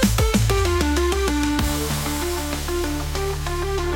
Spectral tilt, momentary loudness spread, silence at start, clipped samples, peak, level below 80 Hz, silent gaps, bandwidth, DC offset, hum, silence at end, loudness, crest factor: -4.5 dB/octave; 6 LU; 0 s; under 0.1%; -6 dBFS; -26 dBFS; none; 17 kHz; under 0.1%; none; 0 s; -22 LUFS; 16 dB